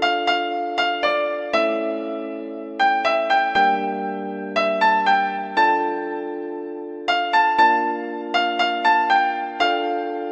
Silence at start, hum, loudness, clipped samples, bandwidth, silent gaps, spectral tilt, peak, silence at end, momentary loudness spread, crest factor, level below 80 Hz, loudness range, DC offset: 0 s; none; -20 LUFS; under 0.1%; 9 kHz; none; -4 dB/octave; -4 dBFS; 0 s; 11 LU; 16 dB; -66 dBFS; 2 LU; under 0.1%